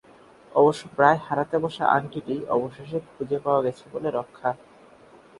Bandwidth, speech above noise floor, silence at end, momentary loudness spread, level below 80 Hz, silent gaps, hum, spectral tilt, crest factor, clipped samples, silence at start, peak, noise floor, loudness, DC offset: 11.5 kHz; 28 dB; 0.85 s; 11 LU; -64 dBFS; none; none; -6.5 dB/octave; 24 dB; under 0.1%; 0.55 s; -2 dBFS; -52 dBFS; -25 LUFS; under 0.1%